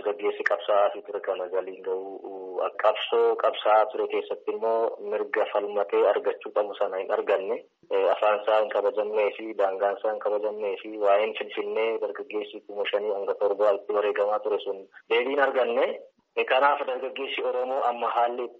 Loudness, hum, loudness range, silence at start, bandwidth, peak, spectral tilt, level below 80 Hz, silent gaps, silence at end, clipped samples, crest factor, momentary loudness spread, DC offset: -26 LUFS; none; 2 LU; 0 s; 6 kHz; -8 dBFS; 0.5 dB/octave; -84 dBFS; none; 0.05 s; under 0.1%; 18 dB; 10 LU; under 0.1%